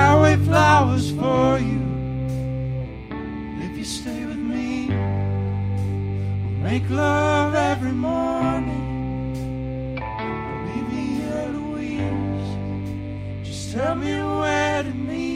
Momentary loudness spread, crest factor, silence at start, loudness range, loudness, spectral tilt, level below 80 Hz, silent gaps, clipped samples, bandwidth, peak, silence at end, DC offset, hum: 11 LU; 20 dB; 0 s; 6 LU; -23 LUFS; -6.5 dB/octave; -40 dBFS; none; under 0.1%; 11.5 kHz; -2 dBFS; 0 s; under 0.1%; none